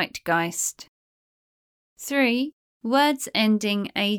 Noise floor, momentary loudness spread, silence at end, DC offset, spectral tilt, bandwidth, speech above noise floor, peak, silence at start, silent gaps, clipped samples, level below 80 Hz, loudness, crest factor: under -90 dBFS; 9 LU; 0 s; under 0.1%; -3 dB/octave; 19 kHz; over 67 dB; -8 dBFS; 0 s; 0.88-1.96 s, 2.53-2.81 s; under 0.1%; -70 dBFS; -23 LUFS; 18 dB